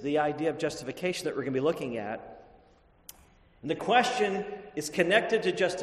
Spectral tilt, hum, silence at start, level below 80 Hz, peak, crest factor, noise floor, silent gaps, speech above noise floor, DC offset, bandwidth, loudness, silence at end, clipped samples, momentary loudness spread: -4.5 dB/octave; none; 0 s; -64 dBFS; -8 dBFS; 22 dB; -61 dBFS; none; 32 dB; under 0.1%; 13.5 kHz; -29 LUFS; 0 s; under 0.1%; 13 LU